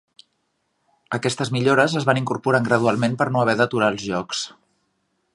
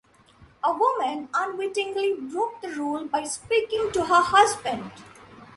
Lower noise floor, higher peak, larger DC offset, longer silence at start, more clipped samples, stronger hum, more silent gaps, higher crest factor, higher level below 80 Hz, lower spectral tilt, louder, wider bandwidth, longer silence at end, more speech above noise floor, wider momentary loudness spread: first, -71 dBFS vs -55 dBFS; about the same, -2 dBFS vs -4 dBFS; neither; first, 1.1 s vs 0.4 s; neither; neither; neither; about the same, 20 dB vs 20 dB; about the same, -60 dBFS vs -60 dBFS; first, -5.5 dB/octave vs -2.5 dB/octave; first, -20 LUFS vs -24 LUFS; about the same, 11.5 kHz vs 11.5 kHz; first, 0.85 s vs 0.05 s; first, 51 dB vs 30 dB; about the same, 9 LU vs 11 LU